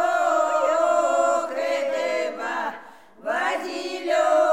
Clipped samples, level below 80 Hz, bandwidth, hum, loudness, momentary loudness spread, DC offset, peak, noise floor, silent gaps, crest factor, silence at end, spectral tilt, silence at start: under 0.1%; -78 dBFS; 14 kHz; none; -23 LUFS; 9 LU; 0.2%; -8 dBFS; -45 dBFS; none; 14 dB; 0 s; -1.5 dB/octave; 0 s